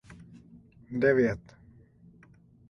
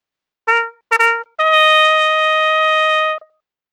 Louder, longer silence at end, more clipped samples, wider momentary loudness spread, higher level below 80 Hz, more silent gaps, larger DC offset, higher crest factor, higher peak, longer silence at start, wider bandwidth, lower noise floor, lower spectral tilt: second, -27 LUFS vs -13 LUFS; first, 1.3 s vs 0.55 s; neither; first, 27 LU vs 9 LU; first, -60 dBFS vs -76 dBFS; neither; neither; about the same, 20 dB vs 16 dB; second, -10 dBFS vs 0 dBFS; second, 0.1 s vs 0.45 s; second, 6.6 kHz vs 19.5 kHz; first, -58 dBFS vs -52 dBFS; first, -8 dB/octave vs 3 dB/octave